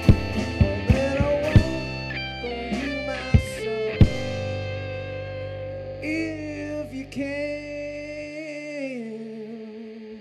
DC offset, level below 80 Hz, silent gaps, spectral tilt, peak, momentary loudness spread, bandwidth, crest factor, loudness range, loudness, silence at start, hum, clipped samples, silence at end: under 0.1%; -34 dBFS; none; -7 dB/octave; -6 dBFS; 13 LU; 12.5 kHz; 20 dB; 8 LU; -26 LUFS; 0 s; none; under 0.1%; 0 s